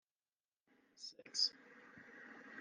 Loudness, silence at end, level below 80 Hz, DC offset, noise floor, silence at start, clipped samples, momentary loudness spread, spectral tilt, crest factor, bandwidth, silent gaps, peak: -38 LUFS; 0 s; under -90 dBFS; under 0.1%; under -90 dBFS; 0.95 s; under 0.1%; 23 LU; 1 dB/octave; 26 dB; 11.5 kHz; none; -24 dBFS